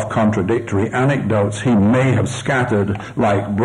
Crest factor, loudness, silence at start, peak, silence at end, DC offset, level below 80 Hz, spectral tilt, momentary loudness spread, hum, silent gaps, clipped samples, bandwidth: 10 dB; -17 LUFS; 0 s; -6 dBFS; 0 s; under 0.1%; -46 dBFS; -7 dB/octave; 5 LU; none; none; under 0.1%; 11.5 kHz